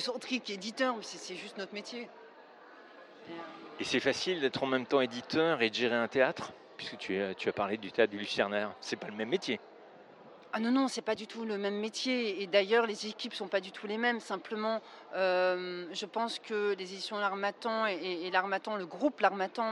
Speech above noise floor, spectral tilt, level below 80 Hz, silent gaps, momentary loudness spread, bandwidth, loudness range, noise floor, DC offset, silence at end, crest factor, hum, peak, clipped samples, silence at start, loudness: 22 dB; -4 dB/octave; -80 dBFS; none; 12 LU; 12 kHz; 5 LU; -55 dBFS; under 0.1%; 0 s; 22 dB; none; -12 dBFS; under 0.1%; 0 s; -33 LUFS